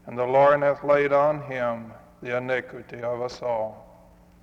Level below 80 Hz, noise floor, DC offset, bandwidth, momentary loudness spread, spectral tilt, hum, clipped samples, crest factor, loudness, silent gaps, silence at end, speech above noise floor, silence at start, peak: -60 dBFS; -52 dBFS; under 0.1%; 7.2 kHz; 16 LU; -6.5 dB/octave; none; under 0.1%; 18 dB; -24 LUFS; none; 0.6 s; 29 dB; 0.05 s; -6 dBFS